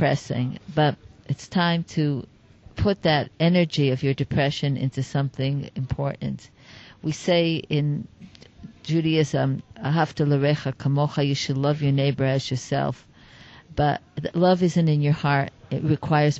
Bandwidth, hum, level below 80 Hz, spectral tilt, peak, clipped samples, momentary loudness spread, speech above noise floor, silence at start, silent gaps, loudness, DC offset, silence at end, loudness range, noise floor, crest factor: 8 kHz; none; -50 dBFS; -6.5 dB/octave; -8 dBFS; under 0.1%; 10 LU; 26 dB; 0 s; none; -24 LUFS; under 0.1%; 0 s; 3 LU; -48 dBFS; 16 dB